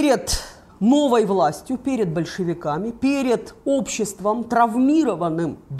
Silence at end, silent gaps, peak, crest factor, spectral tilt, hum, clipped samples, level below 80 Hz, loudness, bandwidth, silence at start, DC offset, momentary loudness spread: 0 s; none; -6 dBFS; 16 dB; -5 dB/octave; none; under 0.1%; -44 dBFS; -21 LUFS; 15 kHz; 0 s; under 0.1%; 8 LU